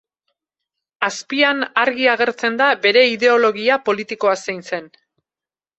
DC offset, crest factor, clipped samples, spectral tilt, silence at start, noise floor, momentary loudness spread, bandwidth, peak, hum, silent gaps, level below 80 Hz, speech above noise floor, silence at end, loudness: under 0.1%; 18 dB; under 0.1%; -3 dB/octave; 1 s; under -90 dBFS; 10 LU; 8.2 kHz; -2 dBFS; none; none; -68 dBFS; over 73 dB; 0.9 s; -17 LUFS